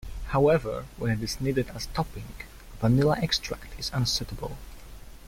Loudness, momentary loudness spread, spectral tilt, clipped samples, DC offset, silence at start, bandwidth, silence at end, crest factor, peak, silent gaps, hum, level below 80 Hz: -27 LUFS; 20 LU; -5.5 dB/octave; under 0.1%; under 0.1%; 0 s; 16.5 kHz; 0 s; 18 dB; -10 dBFS; none; none; -42 dBFS